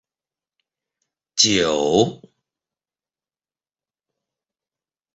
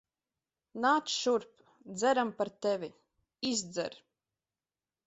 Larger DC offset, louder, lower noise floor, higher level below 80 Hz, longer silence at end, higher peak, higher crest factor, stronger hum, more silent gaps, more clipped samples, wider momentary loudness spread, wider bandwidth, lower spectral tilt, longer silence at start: neither; first, -18 LUFS vs -32 LUFS; about the same, under -90 dBFS vs under -90 dBFS; first, -58 dBFS vs -78 dBFS; first, 3 s vs 1.1 s; first, -2 dBFS vs -16 dBFS; about the same, 24 dB vs 20 dB; neither; neither; neither; second, 8 LU vs 12 LU; about the same, 8.2 kHz vs 8.2 kHz; about the same, -3 dB/octave vs -3 dB/octave; first, 1.35 s vs 0.75 s